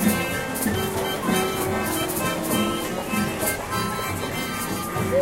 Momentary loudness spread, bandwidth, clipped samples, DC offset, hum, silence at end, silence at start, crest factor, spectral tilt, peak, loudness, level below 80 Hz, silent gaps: 4 LU; 16 kHz; under 0.1%; under 0.1%; none; 0 s; 0 s; 16 dB; -4 dB/octave; -8 dBFS; -24 LUFS; -46 dBFS; none